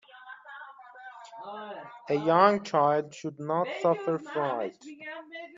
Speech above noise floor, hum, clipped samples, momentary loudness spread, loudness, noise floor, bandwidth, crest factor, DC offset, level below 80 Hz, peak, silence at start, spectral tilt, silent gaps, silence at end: 20 dB; none; under 0.1%; 24 LU; -27 LUFS; -48 dBFS; 7.6 kHz; 24 dB; under 0.1%; -78 dBFS; -6 dBFS; 0.15 s; -6 dB/octave; none; 0 s